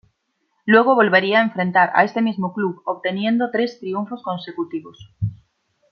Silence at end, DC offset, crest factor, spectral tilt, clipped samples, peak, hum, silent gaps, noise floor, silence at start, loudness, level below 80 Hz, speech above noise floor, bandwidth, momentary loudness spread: 0.55 s; under 0.1%; 18 dB; -7.5 dB/octave; under 0.1%; -2 dBFS; none; none; -70 dBFS; 0.65 s; -19 LUFS; -56 dBFS; 51 dB; 6.6 kHz; 14 LU